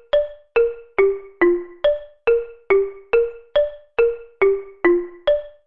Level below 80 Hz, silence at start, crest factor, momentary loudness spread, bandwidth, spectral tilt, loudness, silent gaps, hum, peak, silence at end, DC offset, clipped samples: -46 dBFS; 0.15 s; 16 dB; 3 LU; 4.9 kHz; -7.5 dB/octave; -20 LUFS; none; none; -4 dBFS; 0.15 s; 0.6%; under 0.1%